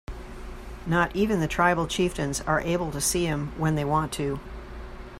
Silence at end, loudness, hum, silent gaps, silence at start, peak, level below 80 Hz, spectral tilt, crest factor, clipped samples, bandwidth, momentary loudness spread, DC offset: 0 s; -26 LUFS; none; none; 0.1 s; -8 dBFS; -40 dBFS; -4.5 dB/octave; 18 dB; under 0.1%; 16 kHz; 18 LU; under 0.1%